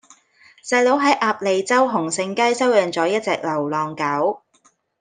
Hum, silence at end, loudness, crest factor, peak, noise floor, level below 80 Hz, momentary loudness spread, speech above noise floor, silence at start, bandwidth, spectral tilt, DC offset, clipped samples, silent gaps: none; 0.65 s; -19 LUFS; 16 dB; -4 dBFS; -60 dBFS; -72 dBFS; 7 LU; 41 dB; 0.65 s; 10 kHz; -4 dB/octave; under 0.1%; under 0.1%; none